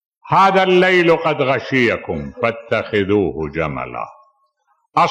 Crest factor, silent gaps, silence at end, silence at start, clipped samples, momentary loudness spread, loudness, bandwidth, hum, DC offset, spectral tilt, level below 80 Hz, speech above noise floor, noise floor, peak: 12 dB; none; 0 s; 0.25 s; under 0.1%; 13 LU; -16 LUFS; 8.8 kHz; none; under 0.1%; -6.5 dB/octave; -46 dBFS; 48 dB; -64 dBFS; -4 dBFS